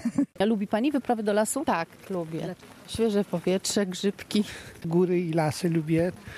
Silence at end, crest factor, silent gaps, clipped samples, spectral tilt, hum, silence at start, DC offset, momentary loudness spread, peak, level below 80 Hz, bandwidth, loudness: 0 s; 16 dB; none; under 0.1%; -5.5 dB/octave; none; 0 s; under 0.1%; 9 LU; -12 dBFS; -60 dBFS; 14.5 kHz; -27 LUFS